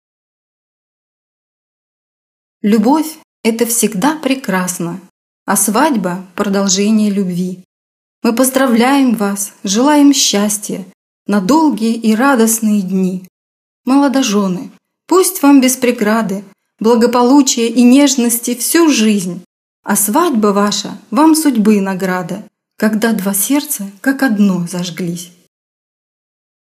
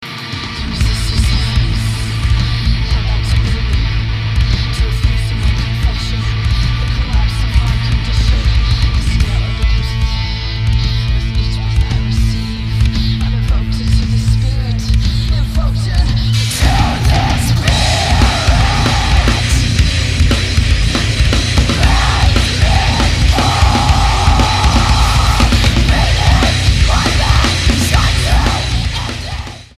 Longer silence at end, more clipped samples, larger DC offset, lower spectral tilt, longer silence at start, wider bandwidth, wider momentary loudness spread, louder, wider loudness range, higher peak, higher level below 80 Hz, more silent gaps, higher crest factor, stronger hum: first, 1.5 s vs 0.1 s; neither; neither; about the same, -4 dB/octave vs -4.5 dB/octave; first, 2.65 s vs 0 s; first, 16 kHz vs 14 kHz; first, 12 LU vs 5 LU; about the same, -12 LUFS vs -14 LUFS; about the same, 5 LU vs 4 LU; about the same, 0 dBFS vs 0 dBFS; second, -64 dBFS vs -16 dBFS; first, 3.24-3.44 s, 5.10-5.46 s, 7.65-8.22 s, 10.94-11.25 s, 13.29-13.84 s, 19.46-19.83 s vs none; about the same, 14 dB vs 12 dB; neither